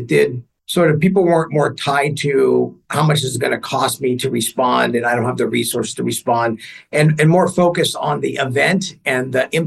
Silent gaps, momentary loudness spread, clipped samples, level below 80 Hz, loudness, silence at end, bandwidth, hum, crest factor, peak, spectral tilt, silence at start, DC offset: none; 7 LU; under 0.1%; -58 dBFS; -17 LUFS; 0 s; 13 kHz; none; 16 dB; -2 dBFS; -5 dB/octave; 0 s; under 0.1%